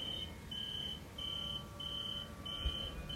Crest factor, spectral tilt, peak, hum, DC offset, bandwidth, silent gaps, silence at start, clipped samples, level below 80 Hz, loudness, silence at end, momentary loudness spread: 18 dB; -4 dB/octave; -26 dBFS; none; under 0.1%; 16 kHz; none; 0 s; under 0.1%; -52 dBFS; -41 LUFS; 0 s; 4 LU